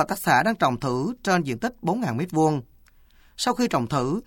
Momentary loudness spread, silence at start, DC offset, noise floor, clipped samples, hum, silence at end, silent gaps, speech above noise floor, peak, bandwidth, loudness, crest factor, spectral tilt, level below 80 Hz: 7 LU; 0 s; under 0.1%; -54 dBFS; under 0.1%; none; 0.05 s; none; 31 dB; -6 dBFS; 19 kHz; -24 LUFS; 18 dB; -5.5 dB/octave; -52 dBFS